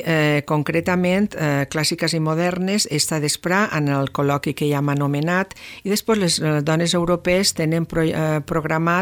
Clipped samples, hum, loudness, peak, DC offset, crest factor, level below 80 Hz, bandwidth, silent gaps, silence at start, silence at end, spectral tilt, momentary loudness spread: under 0.1%; none; -20 LUFS; -4 dBFS; under 0.1%; 16 dB; -48 dBFS; 19.5 kHz; none; 0 s; 0 s; -4.5 dB/octave; 4 LU